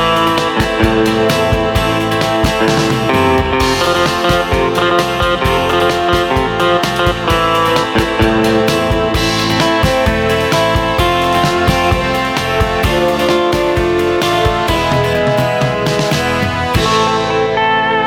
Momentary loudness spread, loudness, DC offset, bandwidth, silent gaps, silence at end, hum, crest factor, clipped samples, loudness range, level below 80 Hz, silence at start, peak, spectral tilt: 2 LU; -13 LUFS; under 0.1%; 18 kHz; none; 0 s; none; 12 dB; under 0.1%; 1 LU; -26 dBFS; 0 s; 0 dBFS; -5 dB/octave